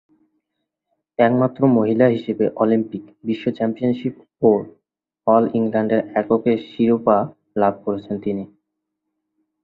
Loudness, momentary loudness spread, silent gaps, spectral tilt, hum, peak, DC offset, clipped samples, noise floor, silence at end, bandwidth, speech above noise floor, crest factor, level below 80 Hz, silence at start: -19 LUFS; 10 LU; none; -10 dB/octave; none; -2 dBFS; under 0.1%; under 0.1%; -78 dBFS; 1.15 s; 4.7 kHz; 60 dB; 18 dB; -60 dBFS; 1.2 s